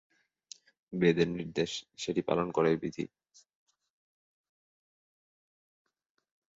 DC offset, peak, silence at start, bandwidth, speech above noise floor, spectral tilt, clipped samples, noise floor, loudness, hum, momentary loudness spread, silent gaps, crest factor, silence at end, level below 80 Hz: under 0.1%; -12 dBFS; 0.9 s; 8 kHz; 26 dB; -6 dB/octave; under 0.1%; -56 dBFS; -31 LUFS; none; 24 LU; none; 22 dB; 3.5 s; -66 dBFS